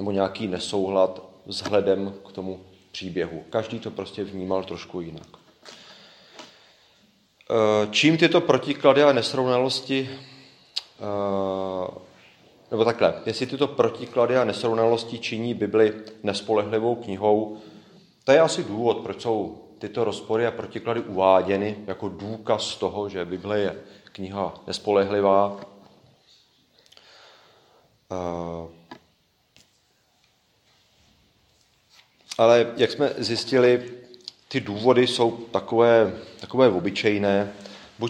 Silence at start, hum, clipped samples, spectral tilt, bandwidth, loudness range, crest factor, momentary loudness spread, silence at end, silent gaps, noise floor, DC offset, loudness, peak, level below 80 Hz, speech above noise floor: 0 s; none; under 0.1%; -5 dB/octave; 11.5 kHz; 14 LU; 22 dB; 16 LU; 0 s; none; -66 dBFS; under 0.1%; -23 LUFS; -2 dBFS; -64 dBFS; 43 dB